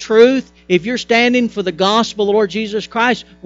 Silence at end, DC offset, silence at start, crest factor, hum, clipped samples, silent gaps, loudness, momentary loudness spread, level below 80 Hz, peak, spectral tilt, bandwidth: 0.25 s; under 0.1%; 0 s; 14 dB; none; under 0.1%; none; -15 LUFS; 8 LU; -52 dBFS; 0 dBFS; -4.5 dB/octave; 7.8 kHz